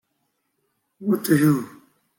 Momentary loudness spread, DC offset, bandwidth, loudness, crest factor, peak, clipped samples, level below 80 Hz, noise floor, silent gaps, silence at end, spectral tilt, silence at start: 14 LU; under 0.1%; 17 kHz; -21 LUFS; 18 dB; -6 dBFS; under 0.1%; -64 dBFS; -73 dBFS; none; 0.5 s; -6.5 dB/octave; 1 s